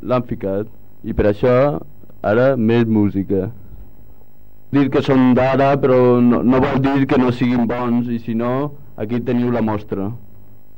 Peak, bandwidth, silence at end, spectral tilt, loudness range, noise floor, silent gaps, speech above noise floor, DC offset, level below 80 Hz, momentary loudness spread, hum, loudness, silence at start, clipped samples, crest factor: -4 dBFS; 16.5 kHz; 0.6 s; -9 dB/octave; 4 LU; -49 dBFS; none; 33 dB; 2%; -42 dBFS; 12 LU; none; -17 LUFS; 0 s; under 0.1%; 12 dB